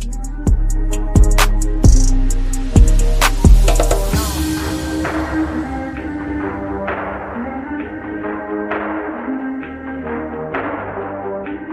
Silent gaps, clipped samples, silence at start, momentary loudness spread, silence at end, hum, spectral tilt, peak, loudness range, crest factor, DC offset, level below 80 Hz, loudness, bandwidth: none; under 0.1%; 0 s; 12 LU; 0 s; none; -5.5 dB/octave; 0 dBFS; 9 LU; 16 dB; under 0.1%; -16 dBFS; -19 LUFS; 15.5 kHz